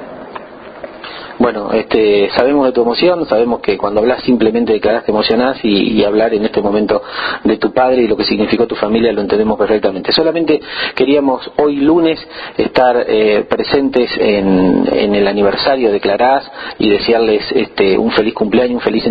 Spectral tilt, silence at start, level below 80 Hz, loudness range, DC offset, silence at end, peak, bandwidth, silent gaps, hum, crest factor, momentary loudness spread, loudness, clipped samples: -8 dB/octave; 0 s; -42 dBFS; 1 LU; under 0.1%; 0 s; 0 dBFS; 5 kHz; none; none; 12 dB; 5 LU; -13 LUFS; under 0.1%